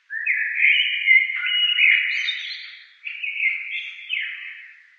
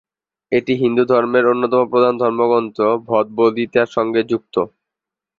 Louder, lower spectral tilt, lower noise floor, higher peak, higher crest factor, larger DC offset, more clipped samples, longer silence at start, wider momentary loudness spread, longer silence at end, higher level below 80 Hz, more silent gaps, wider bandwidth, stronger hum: about the same, -19 LUFS vs -17 LUFS; second, 10 dB/octave vs -7.5 dB/octave; second, -42 dBFS vs -85 dBFS; about the same, -4 dBFS vs -2 dBFS; about the same, 18 dB vs 16 dB; neither; neither; second, 0.1 s vs 0.5 s; first, 19 LU vs 6 LU; second, 0.25 s vs 0.75 s; second, under -90 dBFS vs -60 dBFS; neither; about the same, 7 kHz vs 7 kHz; neither